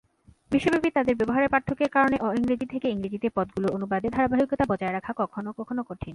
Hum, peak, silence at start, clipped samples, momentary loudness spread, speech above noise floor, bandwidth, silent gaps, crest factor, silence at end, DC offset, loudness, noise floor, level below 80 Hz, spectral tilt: none; -8 dBFS; 0.5 s; under 0.1%; 8 LU; 19 dB; 11.5 kHz; none; 18 dB; 0 s; under 0.1%; -26 LUFS; -44 dBFS; -52 dBFS; -7 dB/octave